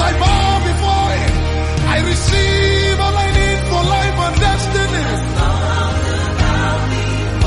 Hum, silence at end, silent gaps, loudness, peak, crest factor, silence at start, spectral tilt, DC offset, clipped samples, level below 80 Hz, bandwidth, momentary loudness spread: none; 0 s; none; -15 LUFS; -2 dBFS; 12 dB; 0 s; -5 dB/octave; under 0.1%; under 0.1%; -20 dBFS; 11.5 kHz; 4 LU